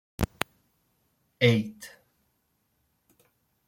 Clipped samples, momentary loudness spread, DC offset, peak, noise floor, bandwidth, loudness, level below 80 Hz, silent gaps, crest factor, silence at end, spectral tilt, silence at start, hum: under 0.1%; 22 LU; under 0.1%; -4 dBFS; -74 dBFS; 16.5 kHz; -28 LUFS; -52 dBFS; none; 30 dB; 1.8 s; -6 dB/octave; 0.2 s; none